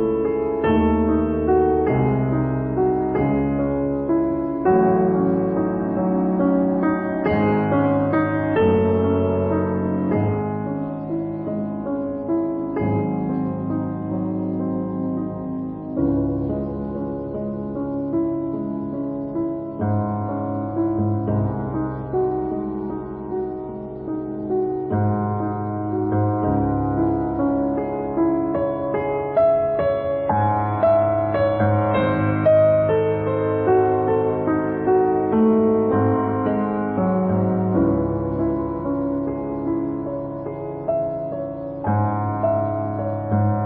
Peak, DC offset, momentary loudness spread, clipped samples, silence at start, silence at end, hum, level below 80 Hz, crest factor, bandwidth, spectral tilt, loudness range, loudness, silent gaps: -8 dBFS; under 0.1%; 9 LU; under 0.1%; 0 s; 0 s; none; -40 dBFS; 12 dB; 4.3 kHz; -13.5 dB/octave; 6 LU; -21 LUFS; none